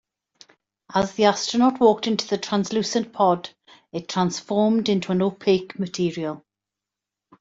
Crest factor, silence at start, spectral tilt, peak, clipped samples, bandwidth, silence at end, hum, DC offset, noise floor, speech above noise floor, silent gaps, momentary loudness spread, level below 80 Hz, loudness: 20 dB; 0.9 s; -5 dB/octave; -4 dBFS; under 0.1%; 7.8 kHz; 1.05 s; none; under 0.1%; -87 dBFS; 65 dB; none; 11 LU; -62 dBFS; -22 LUFS